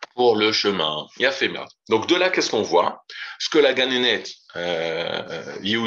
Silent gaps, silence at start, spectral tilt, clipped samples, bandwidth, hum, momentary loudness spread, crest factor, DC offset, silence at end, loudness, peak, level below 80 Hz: none; 0 s; -3 dB/octave; under 0.1%; 7.8 kHz; none; 11 LU; 18 dB; under 0.1%; 0 s; -21 LUFS; -4 dBFS; -70 dBFS